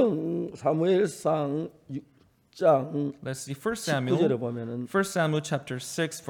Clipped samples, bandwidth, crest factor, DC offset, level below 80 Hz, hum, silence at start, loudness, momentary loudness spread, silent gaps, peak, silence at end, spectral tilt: under 0.1%; 19 kHz; 18 dB; under 0.1%; -68 dBFS; none; 0 s; -28 LUFS; 11 LU; none; -10 dBFS; 0 s; -5.5 dB/octave